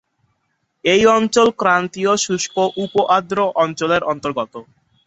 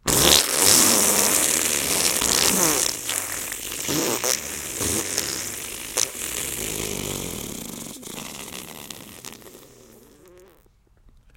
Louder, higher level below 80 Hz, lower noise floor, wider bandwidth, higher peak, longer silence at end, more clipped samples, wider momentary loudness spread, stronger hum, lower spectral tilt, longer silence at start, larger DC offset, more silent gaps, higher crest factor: first, -17 LUFS vs -20 LUFS; second, -56 dBFS vs -48 dBFS; first, -69 dBFS vs -57 dBFS; second, 8.2 kHz vs 17 kHz; about the same, -2 dBFS vs 0 dBFS; second, 0.45 s vs 1.7 s; neither; second, 9 LU vs 20 LU; neither; first, -3.5 dB/octave vs -1 dB/octave; first, 0.85 s vs 0.05 s; neither; neither; second, 16 dB vs 24 dB